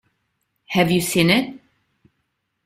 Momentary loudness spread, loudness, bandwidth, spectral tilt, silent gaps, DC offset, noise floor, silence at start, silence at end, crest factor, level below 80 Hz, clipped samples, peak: 8 LU; -18 LUFS; 16 kHz; -4.5 dB/octave; none; under 0.1%; -74 dBFS; 0.7 s; 1.1 s; 20 dB; -54 dBFS; under 0.1%; -2 dBFS